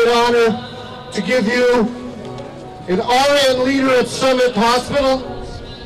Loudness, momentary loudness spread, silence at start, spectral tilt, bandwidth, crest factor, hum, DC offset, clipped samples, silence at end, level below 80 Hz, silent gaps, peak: -15 LUFS; 17 LU; 0 s; -4 dB/octave; 15.5 kHz; 8 dB; none; under 0.1%; under 0.1%; 0 s; -40 dBFS; none; -8 dBFS